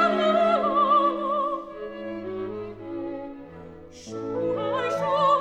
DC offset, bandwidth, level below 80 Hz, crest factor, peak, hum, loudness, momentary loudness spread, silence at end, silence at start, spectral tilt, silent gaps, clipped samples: under 0.1%; 9.4 kHz; -60 dBFS; 16 dB; -10 dBFS; none; -25 LUFS; 19 LU; 0 s; 0 s; -5.5 dB/octave; none; under 0.1%